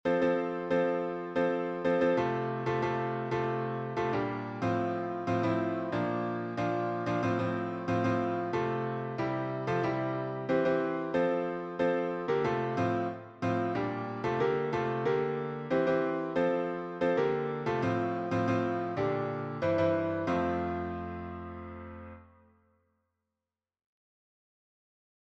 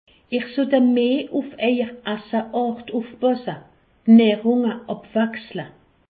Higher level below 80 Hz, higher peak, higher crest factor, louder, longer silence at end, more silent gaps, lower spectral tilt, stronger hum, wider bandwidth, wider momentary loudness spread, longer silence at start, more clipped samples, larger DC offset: about the same, -62 dBFS vs -64 dBFS; second, -16 dBFS vs -4 dBFS; about the same, 14 dB vs 18 dB; second, -31 LUFS vs -20 LUFS; first, 3 s vs 0.45 s; neither; second, -8 dB/octave vs -11 dB/octave; neither; first, 8 kHz vs 4.7 kHz; second, 6 LU vs 17 LU; second, 0.05 s vs 0.3 s; neither; neither